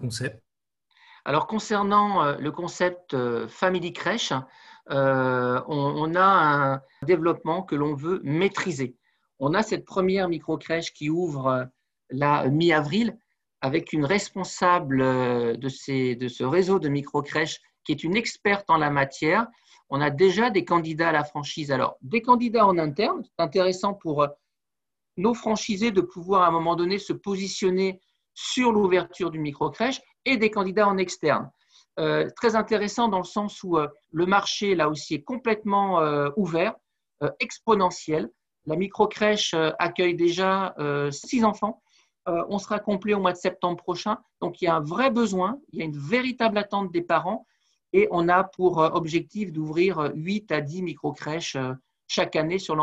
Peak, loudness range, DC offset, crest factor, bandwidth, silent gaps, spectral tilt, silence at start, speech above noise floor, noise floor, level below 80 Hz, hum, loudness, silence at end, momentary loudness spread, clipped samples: -6 dBFS; 3 LU; under 0.1%; 20 dB; 11 kHz; none; -5.5 dB/octave; 0 s; 65 dB; -89 dBFS; -62 dBFS; none; -25 LUFS; 0 s; 9 LU; under 0.1%